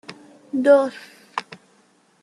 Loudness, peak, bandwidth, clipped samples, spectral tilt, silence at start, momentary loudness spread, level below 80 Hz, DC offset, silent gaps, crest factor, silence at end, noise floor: -20 LUFS; -4 dBFS; 11 kHz; under 0.1%; -5 dB/octave; 0.1 s; 23 LU; -76 dBFS; under 0.1%; none; 20 dB; 0.65 s; -59 dBFS